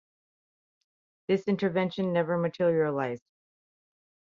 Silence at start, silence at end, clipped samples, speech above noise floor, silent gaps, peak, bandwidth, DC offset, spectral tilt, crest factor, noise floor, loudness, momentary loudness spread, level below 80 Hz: 1.3 s; 1.15 s; under 0.1%; over 63 dB; none; -14 dBFS; 7.2 kHz; under 0.1%; -8 dB/octave; 16 dB; under -90 dBFS; -28 LUFS; 8 LU; -72 dBFS